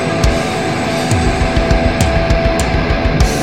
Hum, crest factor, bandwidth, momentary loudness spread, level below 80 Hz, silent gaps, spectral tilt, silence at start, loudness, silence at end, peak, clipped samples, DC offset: none; 14 dB; 16.5 kHz; 3 LU; -18 dBFS; none; -5.5 dB/octave; 0 s; -14 LUFS; 0 s; 0 dBFS; under 0.1%; 1%